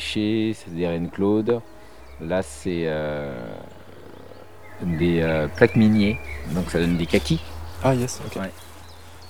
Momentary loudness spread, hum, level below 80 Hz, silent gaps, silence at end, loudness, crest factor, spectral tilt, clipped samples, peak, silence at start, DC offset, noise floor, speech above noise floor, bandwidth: 24 LU; none; -42 dBFS; none; 0 s; -23 LUFS; 24 dB; -6.5 dB/octave; under 0.1%; 0 dBFS; 0 s; 0.6%; -44 dBFS; 22 dB; 19 kHz